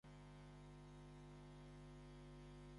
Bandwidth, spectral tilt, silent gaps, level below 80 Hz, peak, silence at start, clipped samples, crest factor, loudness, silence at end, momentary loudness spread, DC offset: 11 kHz; -6.5 dB/octave; none; -66 dBFS; -50 dBFS; 0.05 s; under 0.1%; 10 dB; -61 LUFS; 0 s; 1 LU; under 0.1%